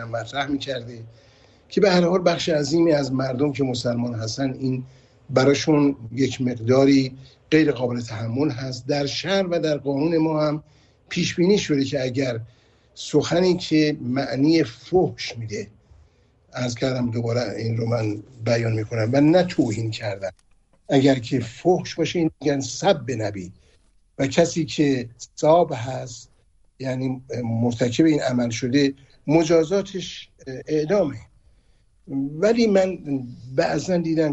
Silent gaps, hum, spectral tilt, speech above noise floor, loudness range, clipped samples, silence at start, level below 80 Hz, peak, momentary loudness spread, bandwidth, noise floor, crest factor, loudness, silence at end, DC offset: none; none; -6 dB/octave; 37 dB; 3 LU; under 0.1%; 0 s; -54 dBFS; -4 dBFS; 12 LU; 8.4 kHz; -58 dBFS; 18 dB; -22 LUFS; 0 s; under 0.1%